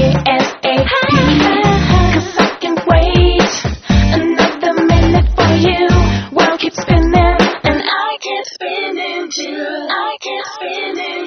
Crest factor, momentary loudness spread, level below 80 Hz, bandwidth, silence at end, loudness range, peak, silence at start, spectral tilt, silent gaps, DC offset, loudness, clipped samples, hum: 12 dB; 10 LU; -20 dBFS; 6.6 kHz; 0 s; 5 LU; 0 dBFS; 0 s; -4.5 dB/octave; none; under 0.1%; -13 LUFS; under 0.1%; none